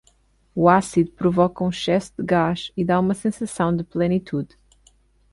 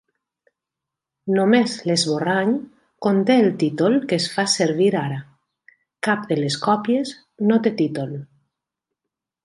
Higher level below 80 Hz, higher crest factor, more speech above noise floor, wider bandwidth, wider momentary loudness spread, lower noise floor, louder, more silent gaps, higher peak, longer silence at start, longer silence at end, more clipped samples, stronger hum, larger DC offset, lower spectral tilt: first, -50 dBFS vs -68 dBFS; about the same, 18 dB vs 18 dB; second, 39 dB vs 66 dB; about the same, 11.5 kHz vs 11.5 kHz; about the same, 9 LU vs 11 LU; second, -60 dBFS vs -85 dBFS; about the same, -21 LUFS vs -20 LUFS; neither; about the same, -2 dBFS vs -4 dBFS; second, 0.55 s vs 1.25 s; second, 0.85 s vs 1.2 s; neither; neither; neither; first, -6.5 dB/octave vs -5 dB/octave